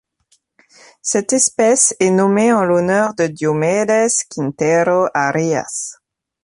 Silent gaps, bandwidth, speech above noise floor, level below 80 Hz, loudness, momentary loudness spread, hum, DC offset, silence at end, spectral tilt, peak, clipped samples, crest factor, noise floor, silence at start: none; 11.5 kHz; 46 dB; -60 dBFS; -15 LUFS; 8 LU; none; under 0.1%; 0.5 s; -4 dB/octave; 0 dBFS; under 0.1%; 16 dB; -61 dBFS; 1.05 s